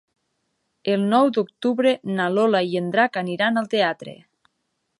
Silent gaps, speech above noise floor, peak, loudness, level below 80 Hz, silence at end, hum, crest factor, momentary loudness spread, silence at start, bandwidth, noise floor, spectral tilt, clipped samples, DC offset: none; 54 dB; -4 dBFS; -21 LUFS; -74 dBFS; 0.85 s; none; 18 dB; 6 LU; 0.85 s; 11.5 kHz; -75 dBFS; -6.5 dB/octave; under 0.1%; under 0.1%